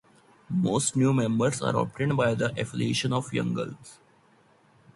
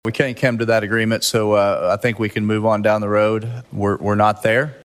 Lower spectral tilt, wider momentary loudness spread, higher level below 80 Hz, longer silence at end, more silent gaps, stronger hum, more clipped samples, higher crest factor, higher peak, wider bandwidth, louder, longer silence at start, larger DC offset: about the same, -5.5 dB/octave vs -5.5 dB/octave; first, 8 LU vs 5 LU; about the same, -60 dBFS vs -56 dBFS; first, 1 s vs 0.1 s; neither; neither; neither; about the same, 16 dB vs 16 dB; second, -10 dBFS vs -2 dBFS; second, 11.5 kHz vs 14.5 kHz; second, -27 LUFS vs -18 LUFS; first, 0.5 s vs 0.05 s; neither